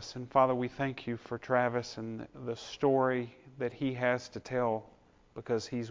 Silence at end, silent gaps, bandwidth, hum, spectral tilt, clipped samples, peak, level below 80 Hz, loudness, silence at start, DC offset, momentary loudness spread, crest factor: 0 s; none; 7.6 kHz; none; -6 dB/octave; under 0.1%; -12 dBFS; -66 dBFS; -33 LUFS; 0 s; under 0.1%; 13 LU; 20 dB